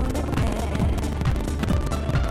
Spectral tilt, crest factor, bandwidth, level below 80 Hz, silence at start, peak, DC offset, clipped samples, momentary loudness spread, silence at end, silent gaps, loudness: -6.5 dB/octave; 12 dB; 15 kHz; -26 dBFS; 0 s; -10 dBFS; under 0.1%; under 0.1%; 1 LU; 0 s; none; -25 LUFS